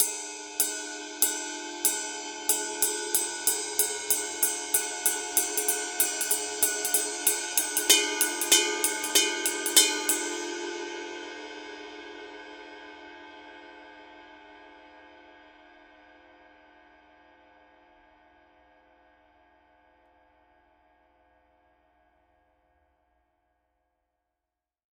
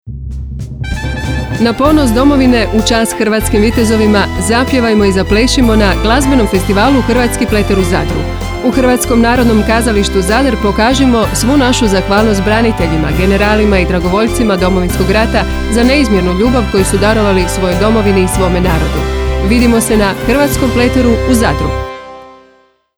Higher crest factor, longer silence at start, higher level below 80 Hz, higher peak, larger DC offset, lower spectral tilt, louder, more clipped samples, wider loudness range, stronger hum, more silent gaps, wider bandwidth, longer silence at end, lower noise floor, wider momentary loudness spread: first, 28 dB vs 10 dB; about the same, 0 s vs 0.05 s; second, -70 dBFS vs -20 dBFS; about the same, -2 dBFS vs 0 dBFS; neither; second, 1.5 dB/octave vs -5 dB/octave; second, -25 LUFS vs -10 LUFS; neither; first, 21 LU vs 1 LU; first, 60 Hz at -80 dBFS vs none; neither; second, 18 kHz vs over 20 kHz; first, 9.55 s vs 0.65 s; first, -88 dBFS vs -48 dBFS; first, 23 LU vs 6 LU